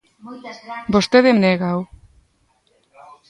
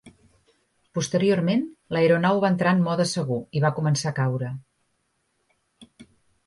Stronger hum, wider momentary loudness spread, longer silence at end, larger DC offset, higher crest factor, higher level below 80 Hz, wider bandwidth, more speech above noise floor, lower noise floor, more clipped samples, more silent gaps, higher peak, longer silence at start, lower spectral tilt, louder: neither; first, 23 LU vs 10 LU; first, 1.45 s vs 0.45 s; neither; about the same, 20 dB vs 18 dB; first, -52 dBFS vs -64 dBFS; about the same, 11.5 kHz vs 11.5 kHz; second, 45 dB vs 50 dB; second, -62 dBFS vs -72 dBFS; neither; neither; first, 0 dBFS vs -8 dBFS; first, 0.25 s vs 0.05 s; about the same, -6 dB/octave vs -6 dB/octave; first, -16 LUFS vs -23 LUFS